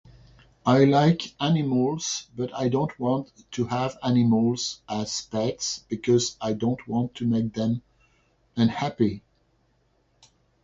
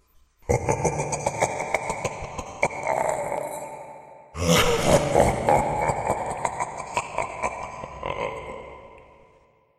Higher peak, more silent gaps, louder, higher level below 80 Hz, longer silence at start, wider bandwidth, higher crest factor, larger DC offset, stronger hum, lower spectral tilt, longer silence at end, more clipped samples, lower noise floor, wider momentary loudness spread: about the same, -6 dBFS vs -4 dBFS; neither; about the same, -25 LUFS vs -25 LUFS; second, -58 dBFS vs -42 dBFS; first, 0.65 s vs 0.45 s; second, 7.8 kHz vs 15.5 kHz; about the same, 20 dB vs 22 dB; neither; neither; first, -5.5 dB/octave vs -4 dB/octave; first, 1.45 s vs 0.75 s; neither; first, -67 dBFS vs -59 dBFS; second, 9 LU vs 18 LU